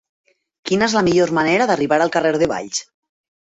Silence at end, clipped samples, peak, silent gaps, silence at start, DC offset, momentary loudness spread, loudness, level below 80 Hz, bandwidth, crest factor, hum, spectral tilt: 0.6 s; under 0.1%; -4 dBFS; none; 0.65 s; under 0.1%; 9 LU; -17 LUFS; -54 dBFS; 8.4 kHz; 16 dB; none; -4.5 dB/octave